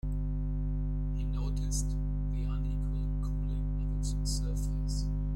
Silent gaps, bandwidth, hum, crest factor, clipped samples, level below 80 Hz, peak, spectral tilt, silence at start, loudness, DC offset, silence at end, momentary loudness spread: none; 12 kHz; 50 Hz at -30 dBFS; 12 dB; under 0.1%; -32 dBFS; -20 dBFS; -6 dB/octave; 0.05 s; -35 LUFS; under 0.1%; 0 s; 2 LU